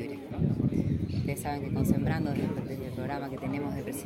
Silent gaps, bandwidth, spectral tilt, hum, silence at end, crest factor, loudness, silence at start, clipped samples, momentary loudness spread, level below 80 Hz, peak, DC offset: none; 16.5 kHz; -7.5 dB/octave; none; 0 s; 18 dB; -31 LUFS; 0 s; under 0.1%; 7 LU; -48 dBFS; -12 dBFS; under 0.1%